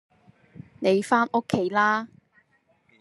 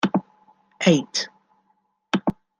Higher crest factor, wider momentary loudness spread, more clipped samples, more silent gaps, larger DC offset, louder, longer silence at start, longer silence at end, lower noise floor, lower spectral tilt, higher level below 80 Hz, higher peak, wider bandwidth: about the same, 20 dB vs 22 dB; about the same, 7 LU vs 9 LU; neither; neither; neither; about the same, -24 LUFS vs -23 LUFS; first, 0.8 s vs 0.05 s; first, 0.95 s vs 0.25 s; about the same, -66 dBFS vs -69 dBFS; about the same, -5.5 dB/octave vs -5 dB/octave; second, -70 dBFS vs -58 dBFS; second, -6 dBFS vs -2 dBFS; first, 12.5 kHz vs 10 kHz